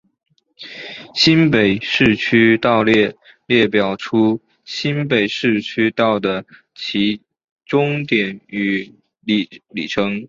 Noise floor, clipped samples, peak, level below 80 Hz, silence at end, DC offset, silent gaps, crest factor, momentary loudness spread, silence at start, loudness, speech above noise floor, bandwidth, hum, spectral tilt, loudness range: -39 dBFS; under 0.1%; 0 dBFS; -52 dBFS; 0.05 s; under 0.1%; 7.44-7.56 s; 18 dB; 15 LU; 0.6 s; -17 LUFS; 22 dB; 7.6 kHz; none; -6 dB/octave; 6 LU